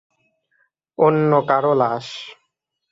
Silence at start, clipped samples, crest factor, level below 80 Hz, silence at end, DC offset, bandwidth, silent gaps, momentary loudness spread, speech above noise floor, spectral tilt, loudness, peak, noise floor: 1 s; under 0.1%; 18 dB; -66 dBFS; 0.6 s; under 0.1%; 7.8 kHz; none; 19 LU; 57 dB; -7.5 dB/octave; -18 LUFS; -2 dBFS; -75 dBFS